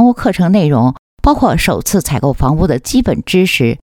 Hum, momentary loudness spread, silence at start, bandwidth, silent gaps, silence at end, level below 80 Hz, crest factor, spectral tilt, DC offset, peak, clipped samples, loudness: none; 4 LU; 0 s; 18 kHz; 0.99-1.17 s; 0.1 s; -24 dBFS; 12 dB; -5.5 dB/octave; under 0.1%; 0 dBFS; under 0.1%; -12 LUFS